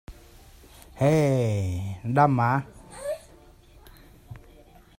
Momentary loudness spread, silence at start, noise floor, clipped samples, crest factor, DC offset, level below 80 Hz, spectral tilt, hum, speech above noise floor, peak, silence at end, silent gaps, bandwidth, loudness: 26 LU; 0.1 s; -52 dBFS; under 0.1%; 22 dB; under 0.1%; -52 dBFS; -7.5 dB/octave; none; 30 dB; -6 dBFS; 0.6 s; none; 16 kHz; -24 LUFS